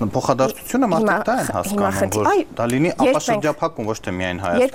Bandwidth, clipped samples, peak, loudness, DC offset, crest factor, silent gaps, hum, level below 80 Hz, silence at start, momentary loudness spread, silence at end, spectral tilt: 17 kHz; under 0.1%; -2 dBFS; -20 LUFS; under 0.1%; 18 dB; none; none; -48 dBFS; 0 s; 6 LU; 0 s; -5 dB/octave